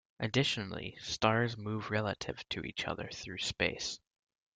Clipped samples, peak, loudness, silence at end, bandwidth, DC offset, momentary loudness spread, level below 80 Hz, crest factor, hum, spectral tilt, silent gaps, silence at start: under 0.1%; -12 dBFS; -35 LUFS; 0.6 s; 9.4 kHz; under 0.1%; 10 LU; -62 dBFS; 24 dB; none; -4 dB/octave; none; 0.2 s